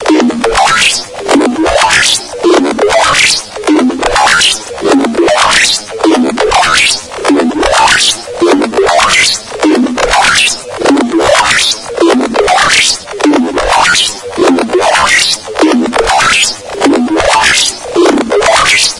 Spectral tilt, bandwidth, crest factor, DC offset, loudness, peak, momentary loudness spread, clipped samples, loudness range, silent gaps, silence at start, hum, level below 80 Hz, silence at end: -1.5 dB/octave; 12 kHz; 8 dB; under 0.1%; -8 LUFS; 0 dBFS; 5 LU; 0.4%; 1 LU; none; 0 s; none; -34 dBFS; 0 s